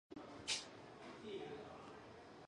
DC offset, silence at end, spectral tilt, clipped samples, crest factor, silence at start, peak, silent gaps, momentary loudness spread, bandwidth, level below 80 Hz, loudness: under 0.1%; 0 s; -2 dB/octave; under 0.1%; 24 dB; 0.1 s; -28 dBFS; none; 14 LU; 11 kHz; -76 dBFS; -49 LUFS